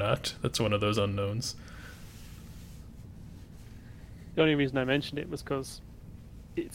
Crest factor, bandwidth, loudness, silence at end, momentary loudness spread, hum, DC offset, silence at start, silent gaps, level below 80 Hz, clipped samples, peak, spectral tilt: 22 dB; 17 kHz; -30 LUFS; 0 s; 22 LU; none; under 0.1%; 0 s; none; -50 dBFS; under 0.1%; -12 dBFS; -5 dB/octave